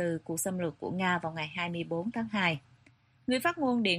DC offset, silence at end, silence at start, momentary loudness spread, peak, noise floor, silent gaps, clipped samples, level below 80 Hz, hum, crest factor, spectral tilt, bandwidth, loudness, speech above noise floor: under 0.1%; 0 s; 0 s; 6 LU; -14 dBFS; -64 dBFS; none; under 0.1%; -68 dBFS; none; 18 dB; -4.5 dB/octave; 13 kHz; -32 LUFS; 32 dB